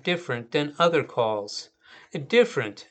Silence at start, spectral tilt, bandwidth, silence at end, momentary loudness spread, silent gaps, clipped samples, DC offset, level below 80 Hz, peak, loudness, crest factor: 0.05 s; -5 dB/octave; 8.8 kHz; 0.1 s; 15 LU; none; under 0.1%; under 0.1%; -76 dBFS; -6 dBFS; -25 LUFS; 18 dB